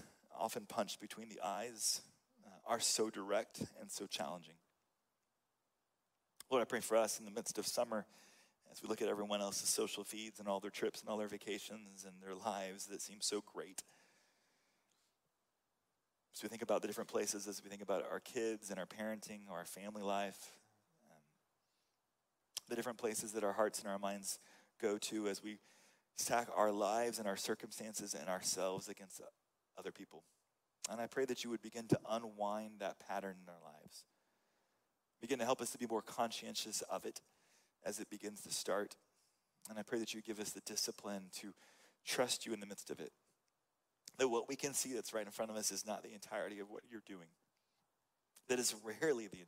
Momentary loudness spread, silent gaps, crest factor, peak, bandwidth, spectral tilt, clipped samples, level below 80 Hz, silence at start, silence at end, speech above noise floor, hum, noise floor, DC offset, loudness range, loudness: 15 LU; none; 24 dB; -20 dBFS; 16 kHz; -2.5 dB/octave; under 0.1%; -88 dBFS; 0 s; 0 s; 45 dB; none; -87 dBFS; under 0.1%; 7 LU; -42 LUFS